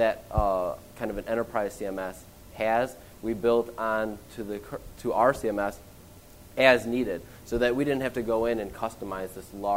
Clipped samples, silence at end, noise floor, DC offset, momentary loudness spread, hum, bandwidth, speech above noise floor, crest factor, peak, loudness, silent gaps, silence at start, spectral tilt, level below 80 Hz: under 0.1%; 0 s; -50 dBFS; 0.1%; 13 LU; none; 16 kHz; 22 dB; 24 dB; -4 dBFS; -28 LUFS; none; 0 s; -5.5 dB/octave; -46 dBFS